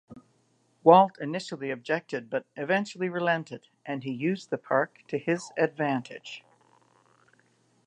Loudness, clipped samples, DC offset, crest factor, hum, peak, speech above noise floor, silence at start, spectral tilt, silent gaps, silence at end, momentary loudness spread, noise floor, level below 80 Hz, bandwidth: -27 LUFS; under 0.1%; under 0.1%; 26 dB; none; -4 dBFS; 41 dB; 0.1 s; -6 dB/octave; none; 1.45 s; 18 LU; -68 dBFS; -80 dBFS; 10 kHz